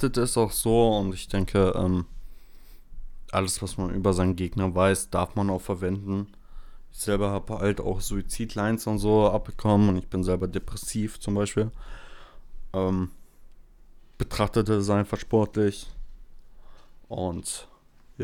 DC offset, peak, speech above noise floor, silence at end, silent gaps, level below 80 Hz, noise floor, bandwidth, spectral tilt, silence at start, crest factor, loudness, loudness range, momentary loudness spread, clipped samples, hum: under 0.1%; -8 dBFS; 25 dB; 0 s; none; -40 dBFS; -50 dBFS; 18 kHz; -6 dB/octave; 0 s; 18 dB; -26 LUFS; 5 LU; 11 LU; under 0.1%; none